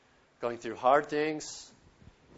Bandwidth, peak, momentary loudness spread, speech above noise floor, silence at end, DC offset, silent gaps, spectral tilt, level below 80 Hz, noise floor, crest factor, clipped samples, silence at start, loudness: 8 kHz; -10 dBFS; 15 LU; 28 dB; 0.25 s; under 0.1%; none; -4 dB/octave; -68 dBFS; -58 dBFS; 22 dB; under 0.1%; 0.4 s; -30 LUFS